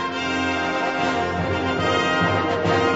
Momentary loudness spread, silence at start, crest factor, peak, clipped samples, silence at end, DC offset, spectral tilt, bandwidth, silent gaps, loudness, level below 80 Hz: 4 LU; 0 s; 14 dB; -8 dBFS; under 0.1%; 0 s; 0.1%; -5 dB/octave; 8 kHz; none; -21 LUFS; -48 dBFS